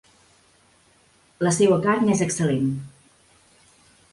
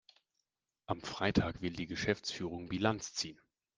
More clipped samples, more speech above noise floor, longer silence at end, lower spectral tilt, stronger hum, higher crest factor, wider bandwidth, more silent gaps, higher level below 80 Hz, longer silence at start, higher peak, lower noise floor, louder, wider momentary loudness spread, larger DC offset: neither; second, 39 dB vs 51 dB; first, 1.25 s vs 0.45 s; about the same, -5.5 dB/octave vs -4.5 dB/octave; neither; second, 18 dB vs 24 dB; first, 11.5 kHz vs 10 kHz; neither; about the same, -60 dBFS vs -60 dBFS; first, 1.4 s vs 0.9 s; first, -6 dBFS vs -14 dBFS; second, -59 dBFS vs -87 dBFS; first, -21 LUFS vs -37 LUFS; about the same, 11 LU vs 9 LU; neither